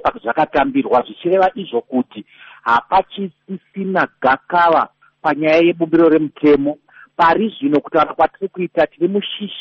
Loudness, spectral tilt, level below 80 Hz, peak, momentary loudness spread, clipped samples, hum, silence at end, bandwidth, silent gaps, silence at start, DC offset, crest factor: -16 LUFS; -3.5 dB/octave; -52 dBFS; -4 dBFS; 12 LU; under 0.1%; none; 0 s; 6.4 kHz; none; 0.05 s; under 0.1%; 14 dB